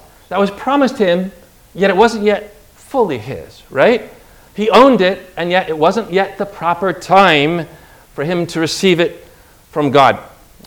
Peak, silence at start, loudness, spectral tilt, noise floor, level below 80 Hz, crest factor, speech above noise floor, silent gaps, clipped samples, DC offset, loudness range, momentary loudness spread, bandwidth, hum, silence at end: 0 dBFS; 0.3 s; -14 LUFS; -5 dB/octave; -43 dBFS; -48 dBFS; 14 dB; 30 dB; none; 0.3%; under 0.1%; 3 LU; 14 LU; over 20 kHz; none; 0.4 s